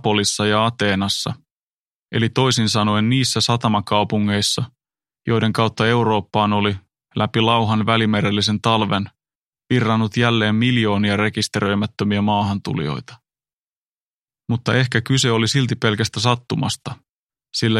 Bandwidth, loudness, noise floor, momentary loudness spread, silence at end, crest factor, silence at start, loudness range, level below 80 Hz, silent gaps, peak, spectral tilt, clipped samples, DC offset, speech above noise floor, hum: 13.5 kHz; -19 LUFS; under -90 dBFS; 8 LU; 0 s; 18 dB; 0.05 s; 3 LU; -54 dBFS; 1.51-2.04 s, 9.35-9.51 s, 13.53-14.26 s, 17.09-17.30 s; 0 dBFS; -5 dB/octave; under 0.1%; under 0.1%; over 72 dB; none